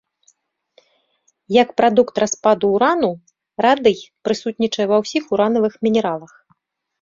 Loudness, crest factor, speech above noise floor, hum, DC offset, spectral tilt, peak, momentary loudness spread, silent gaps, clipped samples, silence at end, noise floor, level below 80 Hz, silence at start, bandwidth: -17 LUFS; 16 dB; 48 dB; none; under 0.1%; -4.5 dB/octave; -2 dBFS; 9 LU; none; under 0.1%; 0.75 s; -65 dBFS; -60 dBFS; 1.5 s; 7.6 kHz